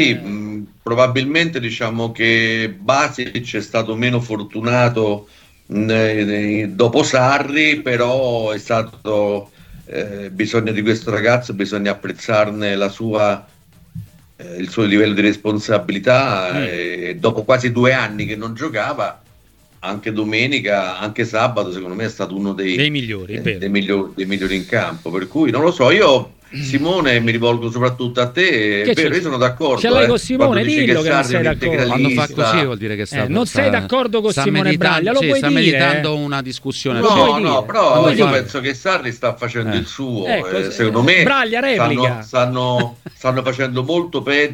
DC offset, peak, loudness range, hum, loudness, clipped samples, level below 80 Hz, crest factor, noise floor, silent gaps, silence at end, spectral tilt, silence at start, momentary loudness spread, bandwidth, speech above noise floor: under 0.1%; 0 dBFS; 5 LU; none; -16 LUFS; under 0.1%; -48 dBFS; 16 dB; -51 dBFS; none; 0 s; -5.5 dB/octave; 0 s; 10 LU; 16.5 kHz; 34 dB